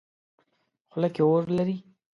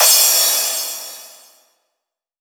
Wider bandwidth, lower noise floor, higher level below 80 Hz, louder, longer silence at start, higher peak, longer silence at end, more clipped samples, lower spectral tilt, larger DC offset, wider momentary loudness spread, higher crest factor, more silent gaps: second, 6.8 kHz vs over 20 kHz; second, -74 dBFS vs -79 dBFS; first, -70 dBFS vs -90 dBFS; second, -25 LUFS vs -13 LUFS; first, 0.95 s vs 0 s; second, -12 dBFS vs -2 dBFS; second, 0.35 s vs 1.15 s; neither; first, -9.5 dB/octave vs 5.5 dB/octave; neither; second, 14 LU vs 22 LU; about the same, 16 dB vs 18 dB; neither